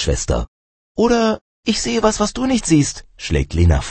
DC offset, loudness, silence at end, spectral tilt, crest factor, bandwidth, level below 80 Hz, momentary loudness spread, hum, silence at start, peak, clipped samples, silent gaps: under 0.1%; -18 LUFS; 0 s; -5 dB/octave; 18 dB; 8.8 kHz; -26 dBFS; 8 LU; none; 0 s; 0 dBFS; under 0.1%; 0.48-0.95 s, 1.41-1.63 s